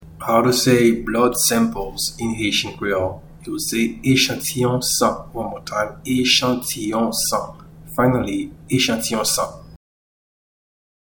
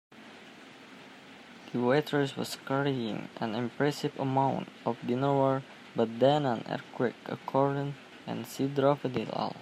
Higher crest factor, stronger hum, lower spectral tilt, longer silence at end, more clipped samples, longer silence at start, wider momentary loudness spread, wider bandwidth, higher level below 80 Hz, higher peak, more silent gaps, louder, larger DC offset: about the same, 18 dB vs 20 dB; neither; second, -3.5 dB/octave vs -6.5 dB/octave; first, 1.3 s vs 0 s; neither; about the same, 0 s vs 0.1 s; second, 11 LU vs 23 LU; first, 19.5 kHz vs 15.5 kHz; first, -44 dBFS vs -74 dBFS; first, -2 dBFS vs -12 dBFS; neither; first, -19 LUFS vs -31 LUFS; neither